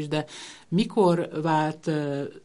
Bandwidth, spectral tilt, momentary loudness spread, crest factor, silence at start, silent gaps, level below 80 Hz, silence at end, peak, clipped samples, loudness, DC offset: 11.5 kHz; -6.5 dB/octave; 9 LU; 16 dB; 0 s; none; -64 dBFS; 0.05 s; -8 dBFS; under 0.1%; -25 LUFS; under 0.1%